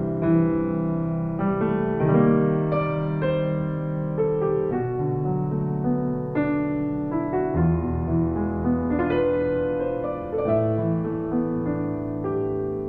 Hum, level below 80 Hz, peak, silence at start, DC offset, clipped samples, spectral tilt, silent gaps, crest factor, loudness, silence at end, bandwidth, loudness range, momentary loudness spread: none; -42 dBFS; -8 dBFS; 0 s; under 0.1%; under 0.1%; -11.5 dB/octave; none; 16 dB; -24 LUFS; 0 s; 4.2 kHz; 2 LU; 5 LU